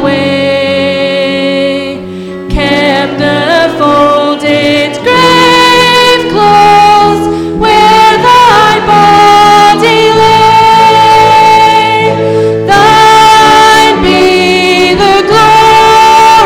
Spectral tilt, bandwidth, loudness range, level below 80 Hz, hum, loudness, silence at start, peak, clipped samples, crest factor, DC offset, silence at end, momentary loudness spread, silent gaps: -4 dB/octave; 18.5 kHz; 6 LU; -30 dBFS; none; -4 LUFS; 0 s; 0 dBFS; 0.3%; 4 dB; under 0.1%; 0 s; 7 LU; none